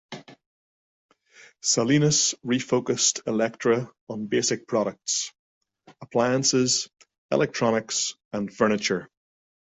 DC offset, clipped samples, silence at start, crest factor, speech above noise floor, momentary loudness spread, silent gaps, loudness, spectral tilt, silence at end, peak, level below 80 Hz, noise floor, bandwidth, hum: under 0.1%; under 0.1%; 0.1 s; 18 dB; over 66 dB; 12 LU; 0.46-1.09 s, 4.01-4.07 s, 5.39-5.61 s, 7.18-7.29 s, 8.25-8.31 s; -24 LUFS; -3.5 dB/octave; 0.55 s; -8 dBFS; -64 dBFS; under -90 dBFS; 8.4 kHz; none